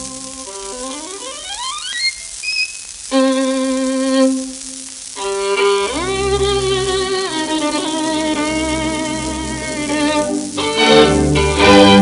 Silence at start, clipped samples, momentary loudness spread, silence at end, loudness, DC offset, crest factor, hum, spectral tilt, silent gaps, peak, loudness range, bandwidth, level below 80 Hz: 0 s; under 0.1%; 15 LU; 0 s; -16 LUFS; under 0.1%; 16 dB; none; -3.5 dB/octave; none; 0 dBFS; 4 LU; 11.5 kHz; -34 dBFS